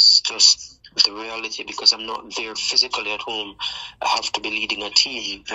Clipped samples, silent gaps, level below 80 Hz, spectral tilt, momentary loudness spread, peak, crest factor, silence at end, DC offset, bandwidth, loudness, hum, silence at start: under 0.1%; none; -58 dBFS; 1.5 dB/octave; 14 LU; -2 dBFS; 20 dB; 0 s; under 0.1%; 10 kHz; -19 LUFS; none; 0 s